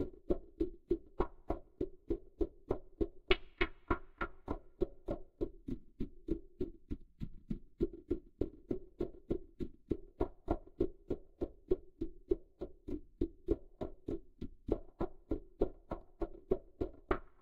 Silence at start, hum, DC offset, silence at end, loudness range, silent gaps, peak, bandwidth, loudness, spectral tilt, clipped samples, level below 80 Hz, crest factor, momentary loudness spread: 0 s; none; under 0.1%; 0.15 s; 4 LU; none; -14 dBFS; 5.4 kHz; -42 LUFS; -8.5 dB/octave; under 0.1%; -48 dBFS; 28 dB; 9 LU